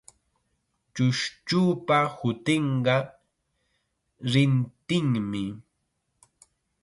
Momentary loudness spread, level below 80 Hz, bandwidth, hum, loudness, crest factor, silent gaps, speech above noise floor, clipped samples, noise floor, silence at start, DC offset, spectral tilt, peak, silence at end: 12 LU; -64 dBFS; 11.5 kHz; none; -25 LUFS; 18 dB; none; 52 dB; under 0.1%; -77 dBFS; 0.95 s; under 0.1%; -6 dB/octave; -10 dBFS; 1.2 s